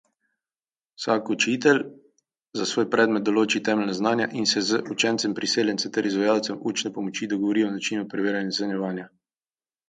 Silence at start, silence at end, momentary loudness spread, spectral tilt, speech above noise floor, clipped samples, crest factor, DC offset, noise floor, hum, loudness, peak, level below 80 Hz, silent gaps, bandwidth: 1 s; 0.8 s; 8 LU; -3.5 dB/octave; over 66 dB; under 0.1%; 20 dB; under 0.1%; under -90 dBFS; none; -24 LUFS; -4 dBFS; -72 dBFS; none; 9.4 kHz